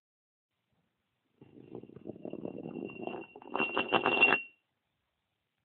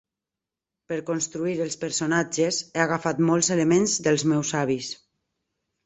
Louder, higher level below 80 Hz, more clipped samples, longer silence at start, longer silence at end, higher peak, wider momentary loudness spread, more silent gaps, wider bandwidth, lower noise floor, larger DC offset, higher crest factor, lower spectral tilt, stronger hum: second, -30 LUFS vs -24 LUFS; second, -74 dBFS vs -64 dBFS; neither; first, 1.4 s vs 0.9 s; first, 1.15 s vs 0.9 s; second, -10 dBFS vs -6 dBFS; first, 24 LU vs 9 LU; neither; second, 4.6 kHz vs 8.4 kHz; second, -84 dBFS vs -88 dBFS; neither; first, 28 dB vs 20 dB; second, -1 dB/octave vs -4 dB/octave; neither